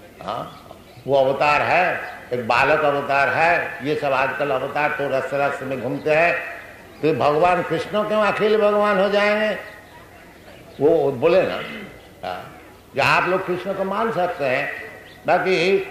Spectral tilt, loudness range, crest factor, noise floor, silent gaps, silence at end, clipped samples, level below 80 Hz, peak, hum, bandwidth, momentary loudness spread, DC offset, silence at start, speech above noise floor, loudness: -5.5 dB/octave; 4 LU; 18 dB; -44 dBFS; none; 0 s; under 0.1%; -54 dBFS; -4 dBFS; none; 15.5 kHz; 14 LU; under 0.1%; 0 s; 24 dB; -20 LUFS